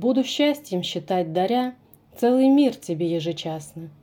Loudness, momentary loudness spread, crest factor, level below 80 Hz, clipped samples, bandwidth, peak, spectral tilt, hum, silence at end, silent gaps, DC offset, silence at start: -23 LUFS; 13 LU; 14 dB; -68 dBFS; under 0.1%; 19 kHz; -8 dBFS; -5.5 dB/octave; none; 0.1 s; none; under 0.1%; 0 s